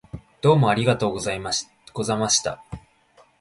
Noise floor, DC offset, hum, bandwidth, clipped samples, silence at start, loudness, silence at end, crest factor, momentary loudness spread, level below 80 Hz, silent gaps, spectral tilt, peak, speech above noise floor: -57 dBFS; under 0.1%; none; 11.5 kHz; under 0.1%; 0.15 s; -22 LUFS; 0.6 s; 18 dB; 20 LU; -50 dBFS; none; -4 dB/octave; -4 dBFS; 36 dB